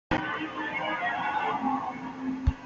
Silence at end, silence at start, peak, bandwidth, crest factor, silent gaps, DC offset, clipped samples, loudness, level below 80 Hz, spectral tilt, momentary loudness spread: 0 s; 0.1 s; -10 dBFS; 7.6 kHz; 20 dB; none; under 0.1%; under 0.1%; -30 LUFS; -40 dBFS; -4 dB/octave; 6 LU